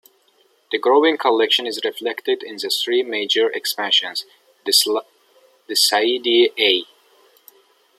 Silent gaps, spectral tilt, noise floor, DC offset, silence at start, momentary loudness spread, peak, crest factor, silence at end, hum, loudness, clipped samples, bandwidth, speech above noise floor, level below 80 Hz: none; -0.5 dB/octave; -59 dBFS; under 0.1%; 0.7 s; 9 LU; -2 dBFS; 18 dB; 1.15 s; none; -18 LUFS; under 0.1%; 15.5 kHz; 41 dB; -80 dBFS